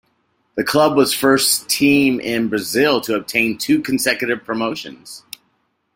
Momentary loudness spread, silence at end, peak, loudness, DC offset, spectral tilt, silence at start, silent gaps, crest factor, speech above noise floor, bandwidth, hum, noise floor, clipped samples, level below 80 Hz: 19 LU; 0.75 s; -2 dBFS; -17 LUFS; under 0.1%; -3 dB/octave; 0.55 s; none; 16 dB; 49 dB; 16.5 kHz; none; -66 dBFS; under 0.1%; -58 dBFS